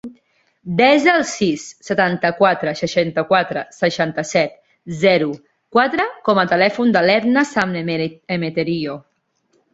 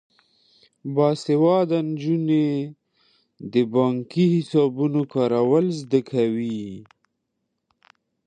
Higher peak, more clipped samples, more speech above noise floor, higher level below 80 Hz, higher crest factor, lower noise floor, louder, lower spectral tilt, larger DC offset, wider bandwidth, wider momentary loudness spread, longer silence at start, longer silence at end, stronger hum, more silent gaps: first, 0 dBFS vs -6 dBFS; neither; second, 47 dB vs 56 dB; first, -58 dBFS vs -70 dBFS; about the same, 18 dB vs 16 dB; second, -64 dBFS vs -77 dBFS; first, -17 LUFS vs -22 LUFS; second, -5 dB/octave vs -8 dB/octave; neither; second, 8 kHz vs 9.6 kHz; about the same, 10 LU vs 11 LU; second, 0.05 s vs 0.85 s; second, 0.75 s vs 1.45 s; neither; neither